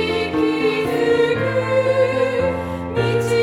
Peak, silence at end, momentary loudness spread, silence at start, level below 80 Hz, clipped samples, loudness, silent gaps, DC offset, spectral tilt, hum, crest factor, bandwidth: -6 dBFS; 0 s; 5 LU; 0 s; -46 dBFS; under 0.1%; -19 LUFS; none; under 0.1%; -6 dB/octave; none; 12 dB; 15.5 kHz